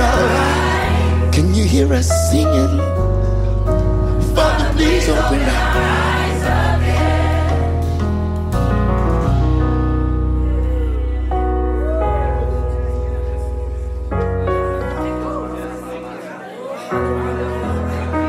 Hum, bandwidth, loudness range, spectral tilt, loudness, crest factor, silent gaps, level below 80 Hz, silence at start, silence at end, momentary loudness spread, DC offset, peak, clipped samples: none; 15 kHz; 7 LU; -6 dB/octave; -17 LUFS; 16 dB; none; -20 dBFS; 0 s; 0 s; 9 LU; under 0.1%; 0 dBFS; under 0.1%